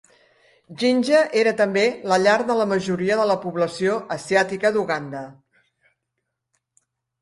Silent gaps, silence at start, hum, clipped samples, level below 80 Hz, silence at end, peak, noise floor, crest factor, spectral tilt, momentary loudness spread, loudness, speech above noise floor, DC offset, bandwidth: none; 0.7 s; none; under 0.1%; -64 dBFS; 1.9 s; -4 dBFS; -79 dBFS; 18 dB; -5 dB/octave; 9 LU; -20 LUFS; 59 dB; under 0.1%; 11.5 kHz